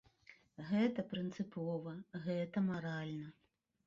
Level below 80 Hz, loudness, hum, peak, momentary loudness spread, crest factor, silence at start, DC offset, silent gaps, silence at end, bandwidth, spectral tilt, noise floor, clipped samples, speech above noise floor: -76 dBFS; -40 LUFS; none; -24 dBFS; 13 LU; 18 dB; 0.3 s; under 0.1%; none; 0.55 s; 7.6 kHz; -6.5 dB/octave; -66 dBFS; under 0.1%; 26 dB